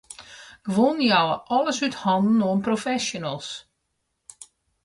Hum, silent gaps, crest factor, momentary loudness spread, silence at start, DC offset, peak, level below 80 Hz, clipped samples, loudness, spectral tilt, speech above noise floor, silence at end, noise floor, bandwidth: none; none; 18 dB; 18 LU; 0.1 s; under 0.1%; -6 dBFS; -64 dBFS; under 0.1%; -23 LUFS; -4.5 dB/octave; 54 dB; 0.4 s; -76 dBFS; 11.5 kHz